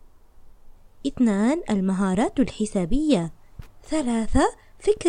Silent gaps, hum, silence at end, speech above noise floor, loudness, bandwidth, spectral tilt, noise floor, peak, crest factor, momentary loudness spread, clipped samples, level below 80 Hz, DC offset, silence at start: none; none; 0 s; 25 dB; -24 LUFS; 10.5 kHz; -6 dB/octave; -47 dBFS; -6 dBFS; 18 dB; 7 LU; under 0.1%; -36 dBFS; under 0.1%; 0.4 s